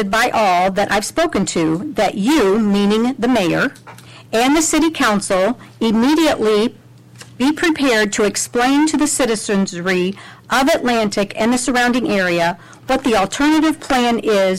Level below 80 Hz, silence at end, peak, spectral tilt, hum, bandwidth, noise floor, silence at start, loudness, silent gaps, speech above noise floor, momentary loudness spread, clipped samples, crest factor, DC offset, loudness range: -44 dBFS; 0 s; -8 dBFS; -4 dB/octave; none; 16 kHz; -40 dBFS; 0 s; -16 LUFS; none; 25 dB; 5 LU; under 0.1%; 8 dB; under 0.1%; 1 LU